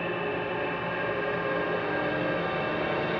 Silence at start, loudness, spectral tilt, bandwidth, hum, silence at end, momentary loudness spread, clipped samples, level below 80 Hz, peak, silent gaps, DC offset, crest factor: 0 s; -29 LUFS; -3.5 dB/octave; 6.6 kHz; none; 0 s; 2 LU; under 0.1%; -56 dBFS; -16 dBFS; none; under 0.1%; 12 dB